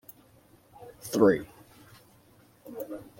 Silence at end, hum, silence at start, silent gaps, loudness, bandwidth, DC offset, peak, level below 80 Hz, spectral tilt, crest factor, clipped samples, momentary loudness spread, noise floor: 0.15 s; none; 0.8 s; none; -27 LUFS; 16.5 kHz; under 0.1%; -8 dBFS; -66 dBFS; -6 dB/octave; 24 dB; under 0.1%; 28 LU; -60 dBFS